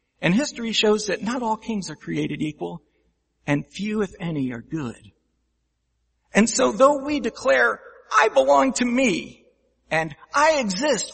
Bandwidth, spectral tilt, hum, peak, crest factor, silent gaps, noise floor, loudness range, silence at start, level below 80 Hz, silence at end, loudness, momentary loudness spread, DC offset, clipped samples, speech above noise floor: 8.8 kHz; -4 dB/octave; none; -2 dBFS; 22 dB; none; -72 dBFS; 10 LU; 0.2 s; -56 dBFS; 0 s; -22 LUFS; 13 LU; under 0.1%; under 0.1%; 51 dB